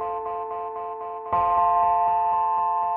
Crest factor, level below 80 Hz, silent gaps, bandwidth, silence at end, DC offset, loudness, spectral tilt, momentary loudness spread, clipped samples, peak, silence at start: 12 dB; -54 dBFS; none; 3.7 kHz; 0 s; under 0.1%; -24 LUFS; -8.5 dB/octave; 12 LU; under 0.1%; -12 dBFS; 0 s